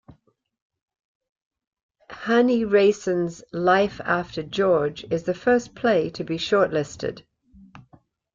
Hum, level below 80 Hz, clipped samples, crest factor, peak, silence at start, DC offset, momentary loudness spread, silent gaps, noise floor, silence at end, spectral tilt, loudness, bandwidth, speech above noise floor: none; -58 dBFS; under 0.1%; 18 dB; -6 dBFS; 2.1 s; under 0.1%; 10 LU; none; -66 dBFS; 0.55 s; -5.5 dB/octave; -22 LUFS; 7.6 kHz; 44 dB